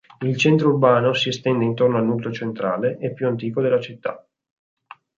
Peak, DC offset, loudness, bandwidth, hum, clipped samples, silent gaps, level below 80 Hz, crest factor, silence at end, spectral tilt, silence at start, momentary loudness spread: -4 dBFS; under 0.1%; -20 LUFS; 7.6 kHz; none; under 0.1%; none; -64 dBFS; 18 dB; 0.95 s; -6.5 dB/octave; 0.2 s; 10 LU